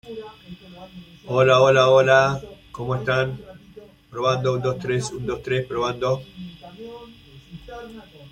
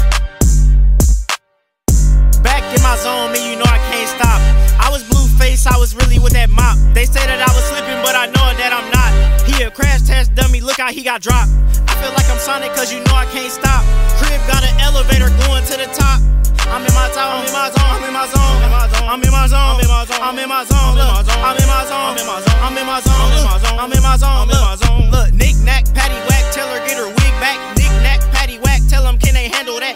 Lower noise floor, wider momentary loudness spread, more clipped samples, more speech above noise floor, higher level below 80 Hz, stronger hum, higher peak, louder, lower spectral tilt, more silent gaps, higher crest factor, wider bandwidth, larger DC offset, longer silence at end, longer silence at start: second, -46 dBFS vs -63 dBFS; first, 27 LU vs 4 LU; neither; second, 25 dB vs 52 dB; second, -52 dBFS vs -12 dBFS; neither; about the same, -2 dBFS vs 0 dBFS; second, -20 LUFS vs -14 LUFS; first, -5.5 dB/octave vs -4 dB/octave; neither; first, 20 dB vs 10 dB; second, 10.5 kHz vs 16.5 kHz; neither; about the same, 0.05 s vs 0 s; about the same, 0.05 s vs 0 s